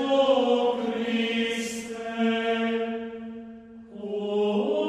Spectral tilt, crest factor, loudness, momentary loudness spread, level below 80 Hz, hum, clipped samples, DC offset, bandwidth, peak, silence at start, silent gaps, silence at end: -4.5 dB/octave; 16 dB; -26 LUFS; 18 LU; -66 dBFS; none; under 0.1%; under 0.1%; 13.5 kHz; -10 dBFS; 0 s; none; 0 s